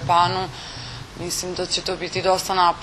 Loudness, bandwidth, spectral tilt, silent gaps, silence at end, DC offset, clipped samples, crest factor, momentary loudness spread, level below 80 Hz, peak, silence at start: -22 LUFS; 13.5 kHz; -3 dB/octave; none; 0 s; under 0.1%; under 0.1%; 18 dB; 14 LU; -46 dBFS; -6 dBFS; 0 s